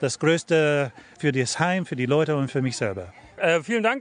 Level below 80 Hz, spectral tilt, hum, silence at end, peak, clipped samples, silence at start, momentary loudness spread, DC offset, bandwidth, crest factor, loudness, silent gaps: -58 dBFS; -5 dB/octave; none; 0 s; -6 dBFS; under 0.1%; 0 s; 8 LU; under 0.1%; 10.5 kHz; 18 dB; -23 LUFS; none